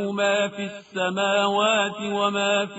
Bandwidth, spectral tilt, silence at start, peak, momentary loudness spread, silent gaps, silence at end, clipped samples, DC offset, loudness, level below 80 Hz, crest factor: 8 kHz; -2 dB/octave; 0 s; -8 dBFS; 7 LU; none; 0 s; under 0.1%; under 0.1%; -23 LUFS; -68 dBFS; 16 dB